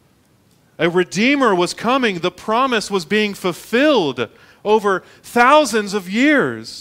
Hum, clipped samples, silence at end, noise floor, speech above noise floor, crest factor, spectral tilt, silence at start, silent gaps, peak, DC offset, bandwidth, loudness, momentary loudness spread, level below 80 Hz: none; under 0.1%; 0 s; -55 dBFS; 39 dB; 18 dB; -4.5 dB/octave; 0.8 s; none; 0 dBFS; under 0.1%; 16 kHz; -17 LUFS; 9 LU; -58 dBFS